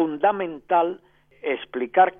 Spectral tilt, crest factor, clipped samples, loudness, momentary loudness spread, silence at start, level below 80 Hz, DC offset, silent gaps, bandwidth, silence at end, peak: -8.5 dB/octave; 18 dB; under 0.1%; -24 LUFS; 10 LU; 0 s; -66 dBFS; under 0.1%; none; 3.7 kHz; 0.1 s; -4 dBFS